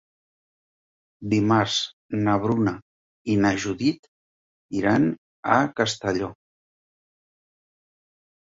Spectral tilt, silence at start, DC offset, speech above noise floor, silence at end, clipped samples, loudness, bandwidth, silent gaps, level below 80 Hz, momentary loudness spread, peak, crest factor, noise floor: -5.5 dB/octave; 1.2 s; under 0.1%; over 68 dB; 2.15 s; under 0.1%; -23 LUFS; 7.8 kHz; 1.93-2.09 s, 2.82-3.25 s, 3.99-4.69 s, 5.18-5.43 s; -56 dBFS; 12 LU; -4 dBFS; 22 dB; under -90 dBFS